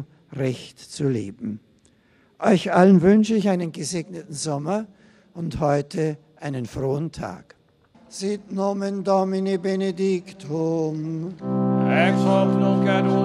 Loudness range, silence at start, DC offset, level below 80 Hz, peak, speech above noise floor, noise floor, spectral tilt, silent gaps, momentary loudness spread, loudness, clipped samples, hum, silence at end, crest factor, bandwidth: 7 LU; 0 s; under 0.1%; -54 dBFS; -2 dBFS; 37 dB; -59 dBFS; -6.5 dB/octave; none; 15 LU; -22 LUFS; under 0.1%; none; 0 s; 20 dB; 11.5 kHz